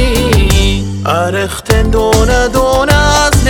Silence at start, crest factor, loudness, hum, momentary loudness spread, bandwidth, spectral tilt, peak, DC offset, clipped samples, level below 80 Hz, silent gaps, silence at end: 0 s; 10 dB; -11 LUFS; none; 6 LU; 18.5 kHz; -4.5 dB/octave; 0 dBFS; under 0.1%; 0.7%; -16 dBFS; none; 0 s